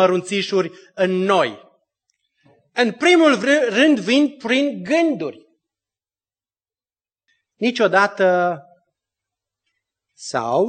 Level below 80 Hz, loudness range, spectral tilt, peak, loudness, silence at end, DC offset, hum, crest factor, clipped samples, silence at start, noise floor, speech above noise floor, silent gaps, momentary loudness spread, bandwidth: -74 dBFS; 7 LU; -4.5 dB/octave; -2 dBFS; -18 LUFS; 0 s; under 0.1%; none; 18 dB; under 0.1%; 0 s; under -90 dBFS; over 73 dB; none; 12 LU; 9 kHz